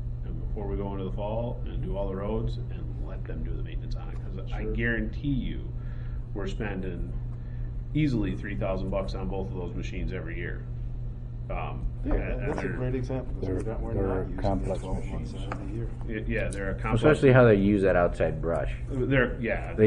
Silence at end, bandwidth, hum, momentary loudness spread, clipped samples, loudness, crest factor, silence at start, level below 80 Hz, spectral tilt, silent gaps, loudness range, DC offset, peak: 0 s; 10.5 kHz; none; 13 LU; under 0.1%; -29 LUFS; 20 dB; 0 s; -34 dBFS; -8 dB/octave; none; 10 LU; under 0.1%; -6 dBFS